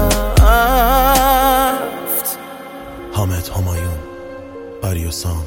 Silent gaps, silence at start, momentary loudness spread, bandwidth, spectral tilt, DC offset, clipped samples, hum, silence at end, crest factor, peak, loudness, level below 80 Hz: none; 0 s; 20 LU; 17 kHz; -4.5 dB/octave; under 0.1%; under 0.1%; none; 0 s; 16 dB; 0 dBFS; -15 LUFS; -22 dBFS